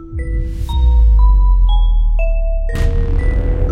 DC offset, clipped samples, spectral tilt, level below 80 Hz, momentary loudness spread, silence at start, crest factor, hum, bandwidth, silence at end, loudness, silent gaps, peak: under 0.1%; under 0.1%; -7.5 dB/octave; -12 dBFS; 9 LU; 0 s; 10 dB; none; 4 kHz; 0 s; -16 LUFS; none; -2 dBFS